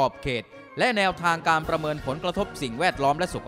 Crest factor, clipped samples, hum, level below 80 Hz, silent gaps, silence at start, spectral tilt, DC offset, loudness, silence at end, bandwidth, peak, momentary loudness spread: 16 dB; under 0.1%; none; -48 dBFS; none; 0 s; -4.5 dB/octave; under 0.1%; -25 LUFS; 0 s; 16 kHz; -8 dBFS; 8 LU